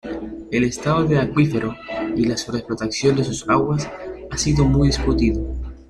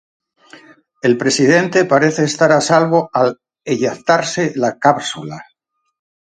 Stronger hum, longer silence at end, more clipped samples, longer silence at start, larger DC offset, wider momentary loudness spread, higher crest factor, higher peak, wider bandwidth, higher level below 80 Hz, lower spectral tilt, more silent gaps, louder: neither; second, 0.05 s vs 0.85 s; neither; second, 0.05 s vs 1.05 s; neither; about the same, 11 LU vs 11 LU; about the same, 16 dB vs 16 dB; second, -4 dBFS vs 0 dBFS; about the same, 11.5 kHz vs 11 kHz; first, -32 dBFS vs -60 dBFS; first, -6 dB/octave vs -4.5 dB/octave; neither; second, -20 LUFS vs -15 LUFS